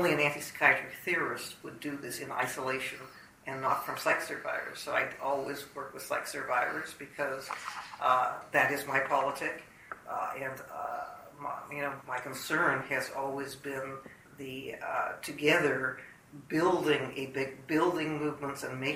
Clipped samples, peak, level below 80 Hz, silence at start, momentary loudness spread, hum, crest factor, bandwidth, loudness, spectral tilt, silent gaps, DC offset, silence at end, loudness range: under 0.1%; -8 dBFS; -70 dBFS; 0 s; 14 LU; none; 24 dB; 16 kHz; -32 LUFS; -4 dB/octave; none; under 0.1%; 0 s; 4 LU